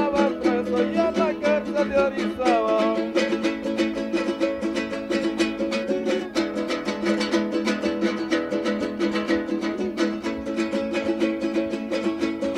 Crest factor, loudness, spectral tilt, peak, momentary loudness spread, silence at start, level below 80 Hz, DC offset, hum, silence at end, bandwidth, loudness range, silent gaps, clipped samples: 16 dB; -24 LUFS; -5 dB/octave; -6 dBFS; 5 LU; 0 s; -54 dBFS; under 0.1%; none; 0 s; 11.5 kHz; 3 LU; none; under 0.1%